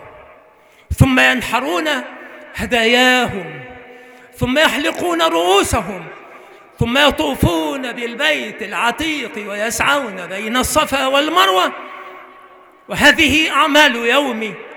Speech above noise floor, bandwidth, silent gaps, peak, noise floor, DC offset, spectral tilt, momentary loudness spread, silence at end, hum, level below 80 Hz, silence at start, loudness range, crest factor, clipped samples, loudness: 32 dB; over 20 kHz; none; 0 dBFS; -48 dBFS; under 0.1%; -3.5 dB/octave; 17 LU; 0 s; none; -38 dBFS; 0 s; 4 LU; 16 dB; under 0.1%; -15 LUFS